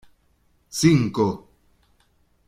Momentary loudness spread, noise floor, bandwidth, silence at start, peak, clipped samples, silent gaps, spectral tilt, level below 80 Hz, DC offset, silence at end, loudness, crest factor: 15 LU; -63 dBFS; 16 kHz; 0.75 s; -4 dBFS; under 0.1%; none; -6 dB/octave; -54 dBFS; under 0.1%; 1.1 s; -21 LUFS; 22 dB